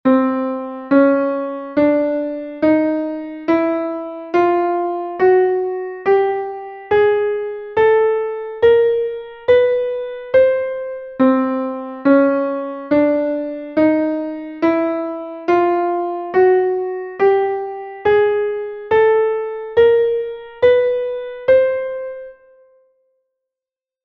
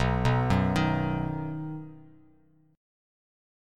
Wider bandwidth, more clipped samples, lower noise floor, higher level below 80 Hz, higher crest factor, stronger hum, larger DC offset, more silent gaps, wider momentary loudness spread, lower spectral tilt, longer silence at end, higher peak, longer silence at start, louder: second, 5.8 kHz vs 11 kHz; neither; first, -89 dBFS vs -62 dBFS; second, -54 dBFS vs -42 dBFS; about the same, 16 dB vs 18 dB; neither; neither; neither; second, 11 LU vs 15 LU; about the same, -8 dB/octave vs -7.5 dB/octave; first, 1.7 s vs 1 s; first, -2 dBFS vs -12 dBFS; about the same, 0.05 s vs 0 s; first, -17 LUFS vs -28 LUFS